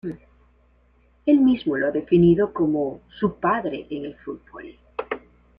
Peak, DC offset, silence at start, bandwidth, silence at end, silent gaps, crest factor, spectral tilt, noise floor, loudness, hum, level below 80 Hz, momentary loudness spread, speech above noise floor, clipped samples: -6 dBFS; under 0.1%; 0.05 s; 4.9 kHz; 0.4 s; none; 16 dB; -10.5 dB/octave; -59 dBFS; -22 LUFS; none; -52 dBFS; 19 LU; 38 dB; under 0.1%